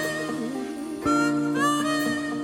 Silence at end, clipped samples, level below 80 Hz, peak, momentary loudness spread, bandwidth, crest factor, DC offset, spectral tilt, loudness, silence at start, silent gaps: 0 s; under 0.1%; -58 dBFS; -12 dBFS; 8 LU; 17 kHz; 14 dB; under 0.1%; -4 dB/octave; -25 LUFS; 0 s; none